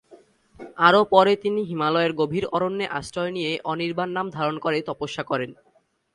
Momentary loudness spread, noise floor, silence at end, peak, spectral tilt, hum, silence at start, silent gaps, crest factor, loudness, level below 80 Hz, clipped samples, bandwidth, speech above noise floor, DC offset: 11 LU; -53 dBFS; 0.6 s; -2 dBFS; -5.5 dB/octave; none; 0.1 s; none; 22 dB; -23 LUFS; -60 dBFS; under 0.1%; 11.5 kHz; 30 dB; under 0.1%